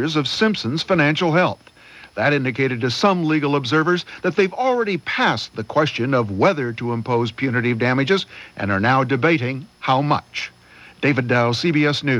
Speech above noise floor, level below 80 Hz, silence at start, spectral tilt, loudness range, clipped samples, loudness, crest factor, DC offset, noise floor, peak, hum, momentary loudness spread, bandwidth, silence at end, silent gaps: 24 dB; -60 dBFS; 0 s; -6 dB/octave; 1 LU; under 0.1%; -19 LUFS; 16 dB; under 0.1%; -44 dBFS; -4 dBFS; none; 7 LU; 11.5 kHz; 0 s; none